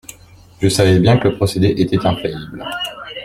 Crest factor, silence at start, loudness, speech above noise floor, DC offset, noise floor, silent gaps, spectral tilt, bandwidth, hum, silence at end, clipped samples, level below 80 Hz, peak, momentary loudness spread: 16 dB; 0.6 s; -16 LUFS; 28 dB; under 0.1%; -43 dBFS; none; -6 dB/octave; 16 kHz; none; 0 s; under 0.1%; -42 dBFS; 0 dBFS; 13 LU